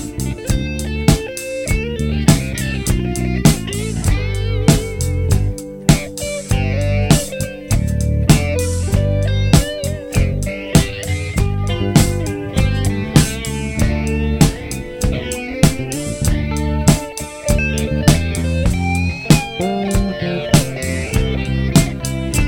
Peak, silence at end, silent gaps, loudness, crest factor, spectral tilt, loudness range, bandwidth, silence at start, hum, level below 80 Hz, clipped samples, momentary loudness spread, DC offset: 0 dBFS; 0 s; none; -17 LUFS; 16 dB; -5.5 dB/octave; 1 LU; 17.5 kHz; 0 s; none; -24 dBFS; under 0.1%; 8 LU; under 0.1%